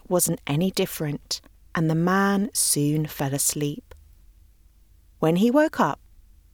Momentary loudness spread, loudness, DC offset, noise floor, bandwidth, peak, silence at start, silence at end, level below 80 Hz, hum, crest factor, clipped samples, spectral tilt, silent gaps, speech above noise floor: 10 LU; -23 LUFS; under 0.1%; -55 dBFS; over 20 kHz; -6 dBFS; 0.1 s; 0.6 s; -52 dBFS; none; 18 dB; under 0.1%; -4.5 dB/octave; none; 32 dB